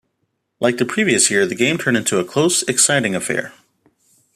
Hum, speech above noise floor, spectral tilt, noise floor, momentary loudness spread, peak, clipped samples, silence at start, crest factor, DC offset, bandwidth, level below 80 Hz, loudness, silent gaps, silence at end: none; 54 dB; -3 dB/octave; -71 dBFS; 7 LU; 0 dBFS; under 0.1%; 0.6 s; 18 dB; under 0.1%; 14.5 kHz; -62 dBFS; -16 LUFS; none; 0.85 s